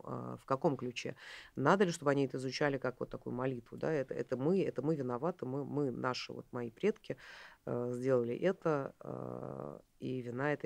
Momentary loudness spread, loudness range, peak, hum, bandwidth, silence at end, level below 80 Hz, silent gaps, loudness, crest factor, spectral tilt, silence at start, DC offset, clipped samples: 13 LU; 3 LU; -14 dBFS; none; 15 kHz; 0.1 s; -70 dBFS; none; -37 LUFS; 22 dB; -6.5 dB/octave; 0.05 s; under 0.1%; under 0.1%